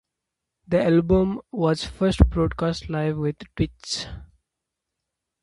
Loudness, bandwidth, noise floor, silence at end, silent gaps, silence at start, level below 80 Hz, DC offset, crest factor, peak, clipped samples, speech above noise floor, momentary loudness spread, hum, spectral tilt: -23 LUFS; 11.5 kHz; -84 dBFS; 1.2 s; none; 0.7 s; -32 dBFS; under 0.1%; 24 dB; 0 dBFS; under 0.1%; 61 dB; 10 LU; none; -6.5 dB/octave